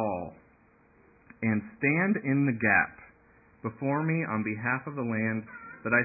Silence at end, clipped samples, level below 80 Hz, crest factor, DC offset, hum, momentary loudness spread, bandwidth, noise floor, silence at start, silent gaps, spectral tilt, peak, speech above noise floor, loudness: 0 s; under 0.1%; -62 dBFS; 20 dB; under 0.1%; none; 14 LU; 2.7 kHz; -62 dBFS; 0 s; none; -14 dB/octave; -10 dBFS; 33 dB; -29 LUFS